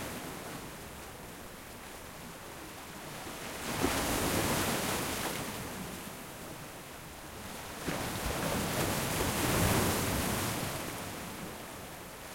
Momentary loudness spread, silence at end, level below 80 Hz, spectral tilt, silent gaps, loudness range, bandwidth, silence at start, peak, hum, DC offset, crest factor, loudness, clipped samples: 15 LU; 0 s; -50 dBFS; -3.5 dB/octave; none; 8 LU; 16.5 kHz; 0 s; -16 dBFS; none; under 0.1%; 20 dB; -35 LUFS; under 0.1%